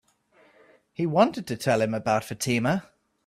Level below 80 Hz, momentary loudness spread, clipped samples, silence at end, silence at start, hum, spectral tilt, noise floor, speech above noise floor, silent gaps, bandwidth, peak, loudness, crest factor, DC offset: -64 dBFS; 8 LU; under 0.1%; 0.45 s; 1 s; none; -5.5 dB/octave; -61 dBFS; 37 dB; none; 15.5 kHz; -8 dBFS; -25 LUFS; 20 dB; under 0.1%